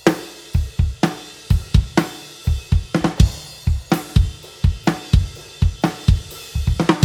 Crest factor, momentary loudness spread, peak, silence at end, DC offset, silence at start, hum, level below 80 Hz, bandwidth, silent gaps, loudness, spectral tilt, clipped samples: 18 dB; 7 LU; 0 dBFS; 0 s; under 0.1%; 0.05 s; none; -24 dBFS; 17.5 kHz; none; -21 LUFS; -6 dB/octave; under 0.1%